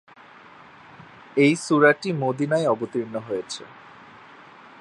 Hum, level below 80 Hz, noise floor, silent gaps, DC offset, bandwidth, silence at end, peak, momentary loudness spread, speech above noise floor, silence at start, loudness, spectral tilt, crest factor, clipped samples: none; -72 dBFS; -48 dBFS; none; under 0.1%; 11.5 kHz; 1.15 s; -2 dBFS; 14 LU; 26 dB; 1.35 s; -22 LUFS; -5.5 dB/octave; 22 dB; under 0.1%